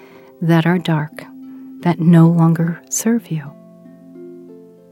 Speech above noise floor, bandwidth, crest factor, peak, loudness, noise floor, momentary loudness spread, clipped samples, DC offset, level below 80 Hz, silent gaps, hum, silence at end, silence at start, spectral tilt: 27 dB; 15 kHz; 18 dB; 0 dBFS; -16 LUFS; -41 dBFS; 25 LU; under 0.1%; under 0.1%; -66 dBFS; none; none; 0.35 s; 0.4 s; -6.5 dB/octave